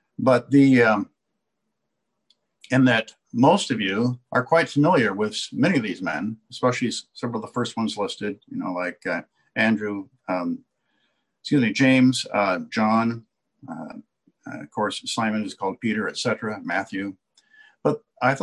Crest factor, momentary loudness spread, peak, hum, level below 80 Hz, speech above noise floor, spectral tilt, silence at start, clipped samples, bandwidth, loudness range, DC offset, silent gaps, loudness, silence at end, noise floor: 18 dB; 14 LU; -4 dBFS; none; -66 dBFS; 57 dB; -5.5 dB/octave; 0.2 s; under 0.1%; 11.5 kHz; 6 LU; under 0.1%; none; -23 LUFS; 0 s; -80 dBFS